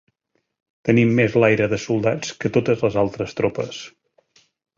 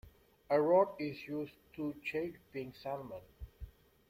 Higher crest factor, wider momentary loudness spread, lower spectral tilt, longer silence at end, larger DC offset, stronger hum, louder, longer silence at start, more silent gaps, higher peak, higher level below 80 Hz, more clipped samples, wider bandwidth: about the same, 18 dB vs 20 dB; second, 12 LU vs 23 LU; about the same, -6.5 dB/octave vs -7.5 dB/octave; first, 0.9 s vs 0.4 s; neither; neither; first, -20 LUFS vs -36 LUFS; first, 0.85 s vs 0.05 s; neither; first, -2 dBFS vs -16 dBFS; first, -52 dBFS vs -60 dBFS; neither; second, 7.6 kHz vs 16 kHz